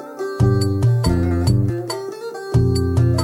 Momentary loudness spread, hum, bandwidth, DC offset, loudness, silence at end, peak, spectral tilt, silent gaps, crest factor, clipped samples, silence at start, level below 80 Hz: 10 LU; none; 14 kHz; under 0.1%; -19 LUFS; 0 s; -6 dBFS; -7 dB/octave; none; 12 dB; under 0.1%; 0 s; -32 dBFS